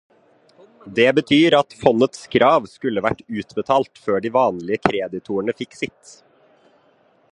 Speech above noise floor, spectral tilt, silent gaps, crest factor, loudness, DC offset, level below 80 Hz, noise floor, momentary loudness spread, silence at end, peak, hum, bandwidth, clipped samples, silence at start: 39 dB; -5.5 dB/octave; none; 20 dB; -19 LUFS; under 0.1%; -56 dBFS; -58 dBFS; 12 LU; 1.45 s; 0 dBFS; none; 11 kHz; under 0.1%; 0.85 s